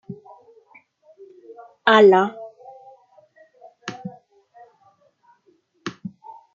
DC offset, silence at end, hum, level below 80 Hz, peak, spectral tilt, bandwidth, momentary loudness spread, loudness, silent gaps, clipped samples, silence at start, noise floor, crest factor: under 0.1%; 0.45 s; none; -72 dBFS; -2 dBFS; -5.5 dB/octave; 7.4 kHz; 27 LU; -15 LUFS; none; under 0.1%; 0.1 s; -62 dBFS; 22 dB